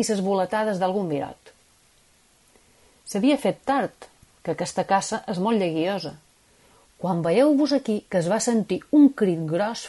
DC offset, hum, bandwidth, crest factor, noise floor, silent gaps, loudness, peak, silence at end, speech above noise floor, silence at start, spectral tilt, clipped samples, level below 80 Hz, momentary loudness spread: under 0.1%; none; 11.5 kHz; 16 dB; -59 dBFS; none; -23 LUFS; -8 dBFS; 0 s; 37 dB; 0 s; -5.5 dB/octave; under 0.1%; -64 dBFS; 12 LU